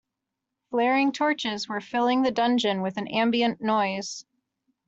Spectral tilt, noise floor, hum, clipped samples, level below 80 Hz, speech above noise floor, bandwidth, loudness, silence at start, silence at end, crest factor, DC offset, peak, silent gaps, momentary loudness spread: -4.5 dB/octave; -84 dBFS; none; under 0.1%; -70 dBFS; 60 dB; 8 kHz; -25 LUFS; 0.7 s; 0.65 s; 16 dB; under 0.1%; -10 dBFS; none; 8 LU